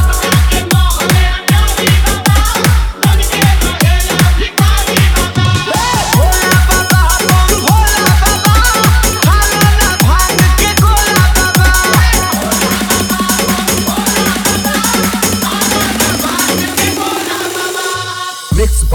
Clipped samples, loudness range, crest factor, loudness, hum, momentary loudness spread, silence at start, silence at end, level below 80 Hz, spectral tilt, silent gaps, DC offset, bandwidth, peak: under 0.1%; 3 LU; 10 dB; -10 LUFS; none; 4 LU; 0 s; 0 s; -14 dBFS; -3.5 dB/octave; none; under 0.1%; over 20 kHz; 0 dBFS